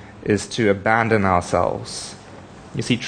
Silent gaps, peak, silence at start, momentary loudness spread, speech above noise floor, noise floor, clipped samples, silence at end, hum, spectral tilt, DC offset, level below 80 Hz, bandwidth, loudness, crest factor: none; -2 dBFS; 0 s; 19 LU; 21 dB; -40 dBFS; under 0.1%; 0 s; none; -5 dB/octave; under 0.1%; -48 dBFS; 10 kHz; -20 LUFS; 20 dB